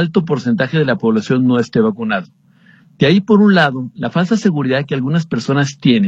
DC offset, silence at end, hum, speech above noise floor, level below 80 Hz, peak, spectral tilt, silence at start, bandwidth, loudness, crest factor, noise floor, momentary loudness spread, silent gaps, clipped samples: under 0.1%; 0 s; none; 34 dB; -54 dBFS; 0 dBFS; -7 dB/octave; 0 s; 7.8 kHz; -15 LUFS; 14 dB; -48 dBFS; 7 LU; none; under 0.1%